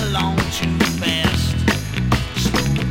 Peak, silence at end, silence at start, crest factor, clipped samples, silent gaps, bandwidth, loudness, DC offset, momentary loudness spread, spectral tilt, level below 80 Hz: -2 dBFS; 0 s; 0 s; 16 dB; under 0.1%; none; 16.5 kHz; -19 LUFS; under 0.1%; 2 LU; -4.5 dB/octave; -30 dBFS